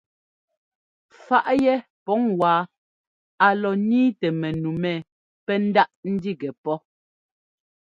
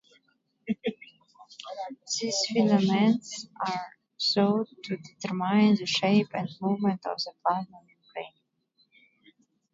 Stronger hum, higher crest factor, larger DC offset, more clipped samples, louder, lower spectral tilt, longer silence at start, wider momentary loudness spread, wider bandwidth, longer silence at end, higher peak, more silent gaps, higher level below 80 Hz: neither; about the same, 22 dB vs 18 dB; neither; neither; first, -22 LUFS vs -27 LUFS; first, -8 dB/octave vs -5 dB/octave; first, 1.3 s vs 0.65 s; second, 10 LU vs 18 LU; about the same, 7.4 kHz vs 7.8 kHz; second, 1.15 s vs 1.45 s; first, -2 dBFS vs -10 dBFS; first, 1.90-2.06 s, 2.77-3.38 s, 5.12-5.47 s, 5.96-6.03 s, 6.58-6.64 s vs none; first, -62 dBFS vs -74 dBFS